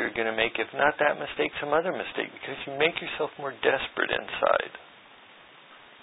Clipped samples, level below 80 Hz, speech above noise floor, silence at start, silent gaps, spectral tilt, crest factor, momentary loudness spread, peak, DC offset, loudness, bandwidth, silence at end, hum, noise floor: under 0.1%; -62 dBFS; 24 dB; 0 s; none; -8 dB/octave; 22 dB; 8 LU; -6 dBFS; under 0.1%; -27 LUFS; 4 kHz; 0.1 s; none; -52 dBFS